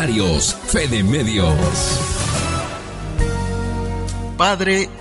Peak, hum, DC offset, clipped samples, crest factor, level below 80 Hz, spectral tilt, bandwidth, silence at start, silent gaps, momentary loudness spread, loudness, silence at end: -4 dBFS; none; under 0.1%; under 0.1%; 16 dB; -28 dBFS; -4 dB/octave; 11.5 kHz; 0 s; none; 8 LU; -19 LUFS; 0 s